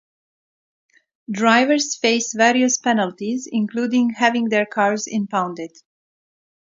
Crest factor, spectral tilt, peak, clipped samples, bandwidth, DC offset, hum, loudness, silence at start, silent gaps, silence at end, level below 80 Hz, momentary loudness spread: 20 dB; -3 dB/octave; 0 dBFS; under 0.1%; 7.8 kHz; under 0.1%; none; -19 LUFS; 1.3 s; none; 1 s; -72 dBFS; 9 LU